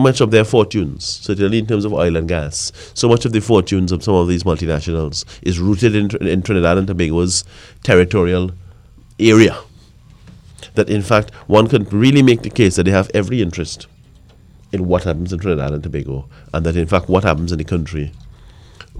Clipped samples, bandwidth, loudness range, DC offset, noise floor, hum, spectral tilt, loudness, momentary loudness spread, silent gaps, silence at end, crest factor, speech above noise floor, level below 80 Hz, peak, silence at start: under 0.1%; 12.5 kHz; 5 LU; under 0.1%; -45 dBFS; none; -6 dB/octave; -16 LUFS; 12 LU; none; 0 s; 16 dB; 30 dB; -34 dBFS; 0 dBFS; 0 s